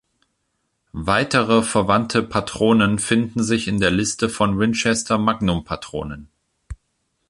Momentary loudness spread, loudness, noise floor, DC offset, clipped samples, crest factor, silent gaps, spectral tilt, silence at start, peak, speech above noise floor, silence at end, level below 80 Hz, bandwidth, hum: 12 LU; -19 LUFS; -72 dBFS; under 0.1%; under 0.1%; 18 dB; none; -4.5 dB/octave; 0.95 s; -2 dBFS; 53 dB; 0.55 s; -42 dBFS; 11.5 kHz; none